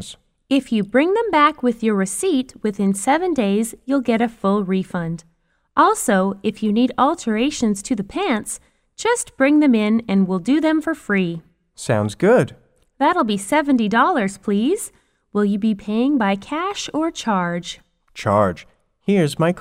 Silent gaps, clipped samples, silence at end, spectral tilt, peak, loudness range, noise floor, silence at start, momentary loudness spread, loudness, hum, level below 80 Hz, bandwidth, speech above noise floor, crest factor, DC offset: none; under 0.1%; 0 s; -5.5 dB/octave; -2 dBFS; 3 LU; -40 dBFS; 0 s; 10 LU; -19 LUFS; none; -54 dBFS; 15.5 kHz; 22 dB; 16 dB; under 0.1%